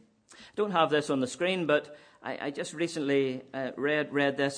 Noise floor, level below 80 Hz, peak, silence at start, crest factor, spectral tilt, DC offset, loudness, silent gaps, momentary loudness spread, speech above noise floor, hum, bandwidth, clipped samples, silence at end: -55 dBFS; -76 dBFS; -12 dBFS; 0.4 s; 18 dB; -4.5 dB/octave; under 0.1%; -29 LUFS; none; 10 LU; 26 dB; none; 10.5 kHz; under 0.1%; 0 s